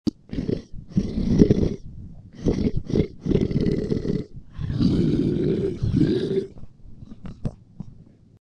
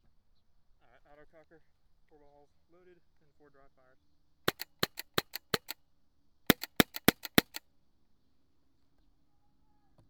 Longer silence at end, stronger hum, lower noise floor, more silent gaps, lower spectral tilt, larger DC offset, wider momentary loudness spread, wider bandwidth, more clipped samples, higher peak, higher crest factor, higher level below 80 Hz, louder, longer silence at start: second, 0.45 s vs 2.7 s; neither; second, -48 dBFS vs -75 dBFS; neither; first, -9 dB/octave vs -3.5 dB/octave; neither; about the same, 21 LU vs 19 LU; second, 9.4 kHz vs over 20 kHz; neither; about the same, 0 dBFS vs -2 dBFS; second, 24 dB vs 36 dB; first, -36 dBFS vs -62 dBFS; first, -24 LUFS vs -31 LUFS; second, 0.05 s vs 4.45 s